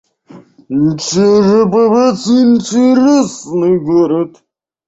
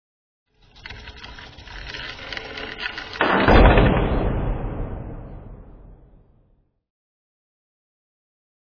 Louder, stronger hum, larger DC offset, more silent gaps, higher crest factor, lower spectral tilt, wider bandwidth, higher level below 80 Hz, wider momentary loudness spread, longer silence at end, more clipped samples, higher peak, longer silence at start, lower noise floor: first, -11 LUFS vs -21 LUFS; neither; neither; neither; second, 10 dB vs 22 dB; second, -6 dB/octave vs -7.5 dB/octave; first, 8 kHz vs 5.4 kHz; second, -52 dBFS vs -28 dBFS; second, 7 LU vs 24 LU; second, 0.6 s vs 2.95 s; neither; about the same, -2 dBFS vs 0 dBFS; second, 0.35 s vs 0.85 s; second, -39 dBFS vs -62 dBFS